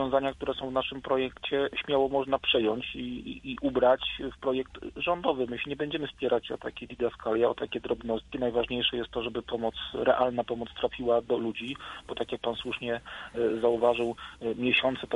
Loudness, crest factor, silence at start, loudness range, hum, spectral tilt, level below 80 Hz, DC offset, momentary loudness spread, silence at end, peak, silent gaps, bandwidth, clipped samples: -30 LUFS; 20 dB; 0 s; 3 LU; none; -6 dB/octave; -54 dBFS; under 0.1%; 10 LU; 0 s; -10 dBFS; none; 11 kHz; under 0.1%